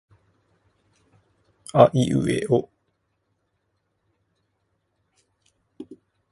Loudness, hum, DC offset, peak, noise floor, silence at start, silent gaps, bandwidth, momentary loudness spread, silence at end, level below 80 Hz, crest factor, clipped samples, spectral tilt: -20 LUFS; none; under 0.1%; 0 dBFS; -74 dBFS; 1.75 s; none; 11.5 kHz; 27 LU; 0.4 s; -58 dBFS; 26 dB; under 0.1%; -7 dB/octave